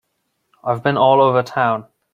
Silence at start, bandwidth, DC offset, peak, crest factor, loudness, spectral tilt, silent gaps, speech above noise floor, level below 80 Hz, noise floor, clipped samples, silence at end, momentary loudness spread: 0.65 s; 7.4 kHz; under 0.1%; -2 dBFS; 16 dB; -16 LUFS; -7 dB/octave; none; 55 dB; -60 dBFS; -71 dBFS; under 0.1%; 0.3 s; 12 LU